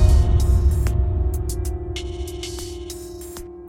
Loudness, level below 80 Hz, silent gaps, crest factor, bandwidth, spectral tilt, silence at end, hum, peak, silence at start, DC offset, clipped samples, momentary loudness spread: -23 LUFS; -22 dBFS; none; 18 dB; 16 kHz; -6.5 dB/octave; 0 s; none; -2 dBFS; 0 s; under 0.1%; under 0.1%; 16 LU